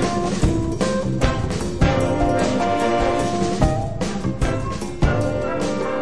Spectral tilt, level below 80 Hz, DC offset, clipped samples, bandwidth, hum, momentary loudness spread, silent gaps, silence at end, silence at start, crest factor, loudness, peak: -6 dB/octave; -28 dBFS; 2%; under 0.1%; 11 kHz; none; 5 LU; none; 0 s; 0 s; 18 dB; -21 LUFS; -2 dBFS